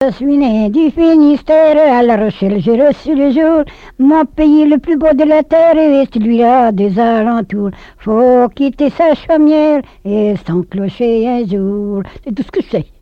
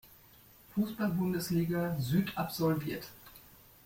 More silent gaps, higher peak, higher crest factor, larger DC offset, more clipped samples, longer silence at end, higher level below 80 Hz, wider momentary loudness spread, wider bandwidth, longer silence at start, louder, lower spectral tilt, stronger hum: neither; first, -2 dBFS vs -18 dBFS; second, 10 dB vs 16 dB; neither; neither; second, 0.2 s vs 0.45 s; first, -38 dBFS vs -62 dBFS; second, 10 LU vs 17 LU; second, 5.8 kHz vs 16.5 kHz; about the same, 0 s vs 0.05 s; first, -11 LUFS vs -33 LUFS; first, -8.5 dB/octave vs -6.5 dB/octave; neither